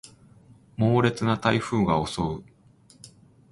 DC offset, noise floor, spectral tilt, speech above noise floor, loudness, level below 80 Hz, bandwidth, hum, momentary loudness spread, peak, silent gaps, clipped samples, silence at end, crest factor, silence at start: under 0.1%; -56 dBFS; -6.5 dB/octave; 33 dB; -24 LUFS; -50 dBFS; 11.5 kHz; none; 10 LU; -6 dBFS; none; under 0.1%; 0.45 s; 20 dB; 0.05 s